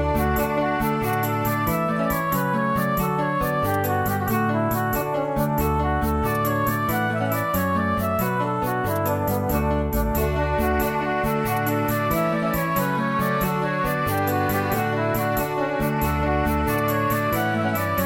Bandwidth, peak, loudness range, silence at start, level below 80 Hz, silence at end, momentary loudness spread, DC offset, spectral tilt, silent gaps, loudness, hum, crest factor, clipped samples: 17 kHz; -8 dBFS; 0 LU; 0 s; -34 dBFS; 0 s; 1 LU; under 0.1%; -6 dB/octave; none; -23 LUFS; none; 14 dB; under 0.1%